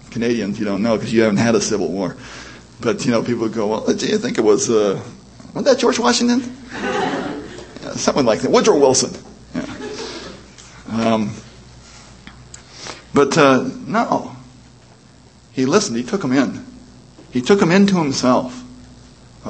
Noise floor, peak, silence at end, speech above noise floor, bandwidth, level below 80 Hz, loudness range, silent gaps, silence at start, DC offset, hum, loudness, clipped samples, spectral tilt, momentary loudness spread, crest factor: -46 dBFS; 0 dBFS; 0 s; 30 dB; 8.8 kHz; -50 dBFS; 5 LU; none; 0.05 s; under 0.1%; none; -17 LUFS; under 0.1%; -4.5 dB/octave; 20 LU; 18 dB